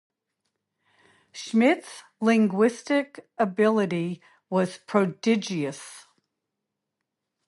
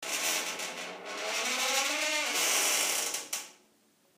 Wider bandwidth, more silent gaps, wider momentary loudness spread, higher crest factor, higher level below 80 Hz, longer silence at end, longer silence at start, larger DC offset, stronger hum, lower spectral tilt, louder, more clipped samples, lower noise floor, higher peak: second, 11.5 kHz vs 15.5 kHz; neither; first, 18 LU vs 12 LU; about the same, 18 dB vs 18 dB; first, -76 dBFS vs under -90 dBFS; first, 1.45 s vs 0.65 s; first, 1.35 s vs 0 s; neither; neither; first, -6 dB/octave vs 1.5 dB/octave; first, -25 LUFS vs -29 LUFS; neither; first, -84 dBFS vs -67 dBFS; first, -8 dBFS vs -14 dBFS